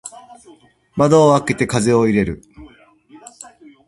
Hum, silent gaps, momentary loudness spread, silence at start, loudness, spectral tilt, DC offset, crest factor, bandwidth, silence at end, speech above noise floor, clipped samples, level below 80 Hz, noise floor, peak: none; none; 23 LU; 0.05 s; -15 LUFS; -6 dB/octave; under 0.1%; 18 dB; 11.5 kHz; 1.2 s; 32 dB; under 0.1%; -46 dBFS; -47 dBFS; 0 dBFS